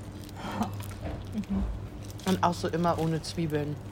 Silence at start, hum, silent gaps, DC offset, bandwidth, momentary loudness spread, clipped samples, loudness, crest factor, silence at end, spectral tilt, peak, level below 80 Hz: 0 s; none; none; under 0.1%; 16.5 kHz; 12 LU; under 0.1%; -31 LUFS; 20 dB; 0 s; -6 dB/octave; -10 dBFS; -44 dBFS